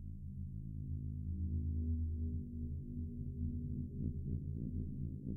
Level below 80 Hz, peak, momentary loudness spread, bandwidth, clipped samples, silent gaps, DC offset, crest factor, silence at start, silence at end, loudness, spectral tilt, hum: -46 dBFS; -28 dBFS; 7 LU; 0.7 kHz; under 0.1%; none; under 0.1%; 12 dB; 0 s; 0 s; -43 LUFS; -13.5 dB/octave; none